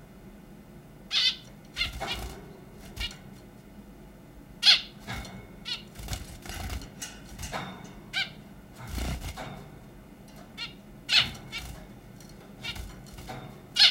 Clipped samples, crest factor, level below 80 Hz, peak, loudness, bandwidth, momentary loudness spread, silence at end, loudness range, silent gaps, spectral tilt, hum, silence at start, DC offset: under 0.1%; 28 dB; -46 dBFS; -4 dBFS; -29 LUFS; 16.5 kHz; 27 LU; 0 s; 10 LU; none; -2 dB/octave; none; 0 s; under 0.1%